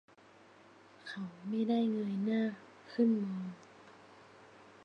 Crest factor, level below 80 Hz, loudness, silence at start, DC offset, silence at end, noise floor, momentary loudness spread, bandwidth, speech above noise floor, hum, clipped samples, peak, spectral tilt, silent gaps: 16 dB; -86 dBFS; -35 LUFS; 1.05 s; under 0.1%; 0.2 s; -61 dBFS; 22 LU; 6.8 kHz; 27 dB; none; under 0.1%; -20 dBFS; -8 dB/octave; none